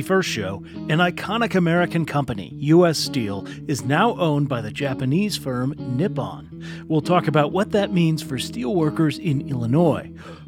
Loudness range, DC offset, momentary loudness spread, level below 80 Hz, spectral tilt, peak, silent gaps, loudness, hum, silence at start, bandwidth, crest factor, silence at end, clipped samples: 2 LU; under 0.1%; 10 LU; -52 dBFS; -6 dB/octave; -2 dBFS; none; -21 LUFS; none; 0 s; 16.5 kHz; 20 dB; 0 s; under 0.1%